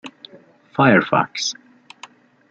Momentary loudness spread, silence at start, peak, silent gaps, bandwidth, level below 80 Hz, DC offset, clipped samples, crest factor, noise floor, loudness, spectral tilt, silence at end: 21 LU; 0.05 s; -2 dBFS; none; 8 kHz; -64 dBFS; under 0.1%; under 0.1%; 20 dB; -48 dBFS; -18 LUFS; -4.5 dB/octave; 1 s